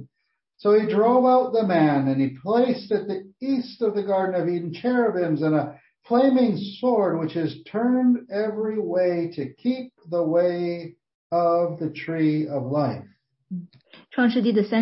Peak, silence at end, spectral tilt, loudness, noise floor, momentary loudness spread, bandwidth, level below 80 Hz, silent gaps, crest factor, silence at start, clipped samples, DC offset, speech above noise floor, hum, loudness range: -8 dBFS; 0 s; -11.5 dB/octave; -23 LUFS; -77 dBFS; 11 LU; 5.8 kHz; -72 dBFS; 11.15-11.30 s; 16 dB; 0 s; under 0.1%; under 0.1%; 55 dB; none; 4 LU